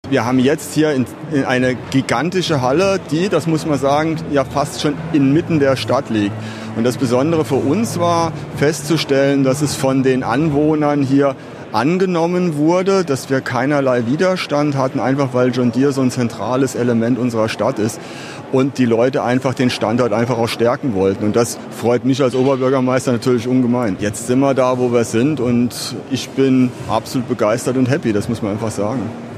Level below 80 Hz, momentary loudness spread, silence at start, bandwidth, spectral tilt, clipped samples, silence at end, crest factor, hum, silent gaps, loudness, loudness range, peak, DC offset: -48 dBFS; 6 LU; 0.05 s; 15 kHz; -6 dB/octave; under 0.1%; 0 s; 14 dB; none; none; -16 LUFS; 2 LU; -2 dBFS; under 0.1%